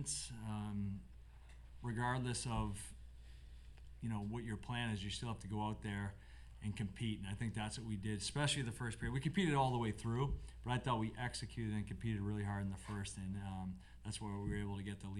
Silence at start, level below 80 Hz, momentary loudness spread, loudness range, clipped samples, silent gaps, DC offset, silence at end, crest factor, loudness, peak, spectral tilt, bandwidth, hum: 0 s; -56 dBFS; 17 LU; 5 LU; under 0.1%; none; under 0.1%; 0 s; 20 dB; -42 LUFS; -22 dBFS; -5 dB/octave; 12.5 kHz; none